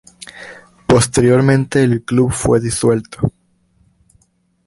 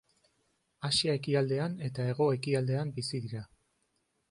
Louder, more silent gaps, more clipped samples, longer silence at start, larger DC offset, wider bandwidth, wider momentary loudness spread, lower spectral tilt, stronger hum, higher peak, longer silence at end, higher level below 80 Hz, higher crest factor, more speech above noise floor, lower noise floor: first, -14 LUFS vs -32 LUFS; neither; neither; second, 0.35 s vs 0.8 s; neither; about the same, 11.5 kHz vs 11.5 kHz; first, 21 LU vs 10 LU; about the same, -6 dB/octave vs -5.5 dB/octave; neither; first, 0 dBFS vs -16 dBFS; first, 1.4 s vs 0.85 s; first, -40 dBFS vs -66 dBFS; about the same, 16 dB vs 18 dB; about the same, 46 dB vs 46 dB; second, -60 dBFS vs -77 dBFS